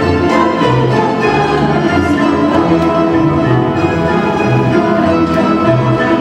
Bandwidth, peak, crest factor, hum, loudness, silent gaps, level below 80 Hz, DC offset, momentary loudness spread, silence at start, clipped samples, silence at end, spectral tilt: 10 kHz; 0 dBFS; 10 dB; none; -12 LUFS; none; -34 dBFS; under 0.1%; 1 LU; 0 s; under 0.1%; 0 s; -7.5 dB/octave